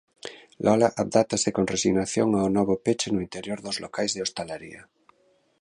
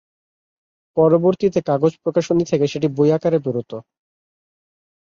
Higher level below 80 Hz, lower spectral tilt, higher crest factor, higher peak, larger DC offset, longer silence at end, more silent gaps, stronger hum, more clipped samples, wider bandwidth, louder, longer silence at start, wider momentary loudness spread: about the same, -56 dBFS vs -60 dBFS; second, -4.5 dB/octave vs -7.5 dB/octave; about the same, 20 dB vs 16 dB; about the same, -6 dBFS vs -4 dBFS; neither; second, 0.8 s vs 1.25 s; neither; neither; neither; first, 11 kHz vs 7.4 kHz; second, -25 LUFS vs -18 LUFS; second, 0.25 s vs 0.95 s; first, 15 LU vs 11 LU